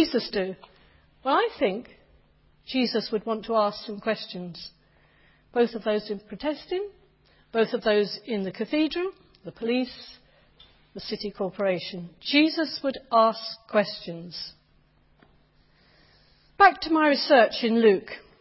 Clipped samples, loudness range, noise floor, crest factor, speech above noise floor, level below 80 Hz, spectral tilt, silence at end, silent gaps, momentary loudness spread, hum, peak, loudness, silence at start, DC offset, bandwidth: under 0.1%; 7 LU; -62 dBFS; 22 dB; 37 dB; -62 dBFS; -8 dB/octave; 0.2 s; none; 18 LU; none; -4 dBFS; -25 LUFS; 0 s; under 0.1%; 5.8 kHz